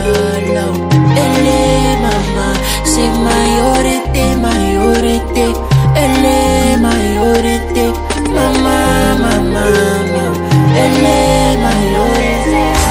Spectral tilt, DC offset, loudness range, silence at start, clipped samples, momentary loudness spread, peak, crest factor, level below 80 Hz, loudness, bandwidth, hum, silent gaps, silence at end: -5 dB/octave; under 0.1%; 1 LU; 0 s; under 0.1%; 4 LU; 0 dBFS; 10 dB; -20 dBFS; -11 LUFS; 16.5 kHz; none; none; 0 s